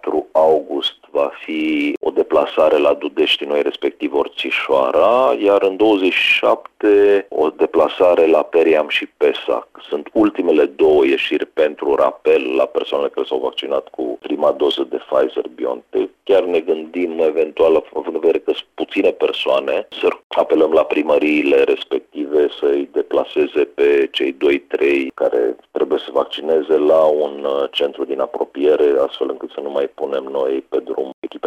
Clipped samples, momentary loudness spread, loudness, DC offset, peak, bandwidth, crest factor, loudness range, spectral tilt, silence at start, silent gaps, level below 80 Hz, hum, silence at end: under 0.1%; 9 LU; -17 LUFS; under 0.1%; -2 dBFS; 10 kHz; 14 dB; 5 LU; -5 dB/octave; 0.05 s; 1.97-2.01 s, 20.24-20.30 s, 31.14-31.22 s; -56 dBFS; none; 0 s